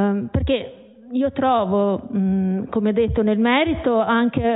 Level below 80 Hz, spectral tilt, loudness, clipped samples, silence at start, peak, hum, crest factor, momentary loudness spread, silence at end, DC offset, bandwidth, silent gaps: -36 dBFS; -12 dB/octave; -20 LUFS; under 0.1%; 0 s; -4 dBFS; none; 16 dB; 6 LU; 0 s; under 0.1%; 4 kHz; none